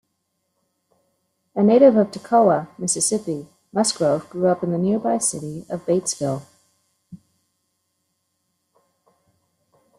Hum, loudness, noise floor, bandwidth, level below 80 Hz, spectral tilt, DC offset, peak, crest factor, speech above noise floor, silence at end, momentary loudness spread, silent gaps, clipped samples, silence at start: none; -20 LUFS; -74 dBFS; 13 kHz; -66 dBFS; -5 dB/octave; under 0.1%; -2 dBFS; 20 dB; 55 dB; 2.8 s; 16 LU; none; under 0.1%; 1.55 s